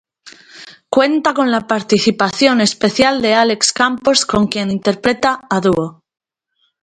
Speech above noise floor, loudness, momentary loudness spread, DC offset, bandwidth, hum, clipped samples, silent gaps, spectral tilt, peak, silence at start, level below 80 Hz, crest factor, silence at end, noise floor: 51 dB; -14 LUFS; 5 LU; under 0.1%; 11 kHz; none; under 0.1%; none; -3.5 dB/octave; 0 dBFS; 0.25 s; -48 dBFS; 16 dB; 0.9 s; -65 dBFS